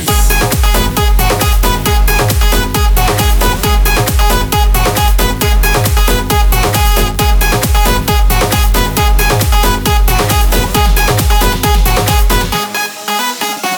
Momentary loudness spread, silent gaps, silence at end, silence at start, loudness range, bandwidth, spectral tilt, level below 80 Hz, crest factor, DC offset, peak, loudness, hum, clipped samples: 1 LU; none; 0 s; 0 s; 0 LU; over 20 kHz; -4 dB/octave; -12 dBFS; 10 dB; under 0.1%; 0 dBFS; -11 LUFS; none; under 0.1%